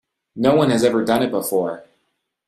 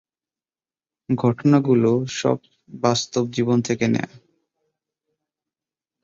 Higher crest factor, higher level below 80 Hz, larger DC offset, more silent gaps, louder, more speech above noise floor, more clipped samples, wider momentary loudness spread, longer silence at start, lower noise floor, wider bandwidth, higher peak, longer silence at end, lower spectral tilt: about the same, 16 dB vs 18 dB; about the same, -58 dBFS vs -60 dBFS; neither; neither; first, -18 LUFS vs -21 LUFS; second, 54 dB vs over 70 dB; neither; about the same, 9 LU vs 8 LU; second, 0.35 s vs 1.1 s; second, -72 dBFS vs under -90 dBFS; first, 16 kHz vs 7.8 kHz; about the same, -2 dBFS vs -4 dBFS; second, 0.65 s vs 1.85 s; about the same, -5.5 dB/octave vs -6 dB/octave